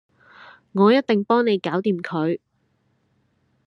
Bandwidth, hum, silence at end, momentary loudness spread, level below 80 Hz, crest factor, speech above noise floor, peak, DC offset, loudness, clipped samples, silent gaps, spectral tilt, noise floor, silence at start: 6.4 kHz; none; 1.3 s; 9 LU; -72 dBFS; 18 dB; 48 dB; -4 dBFS; under 0.1%; -21 LUFS; under 0.1%; none; -8 dB/octave; -67 dBFS; 0.75 s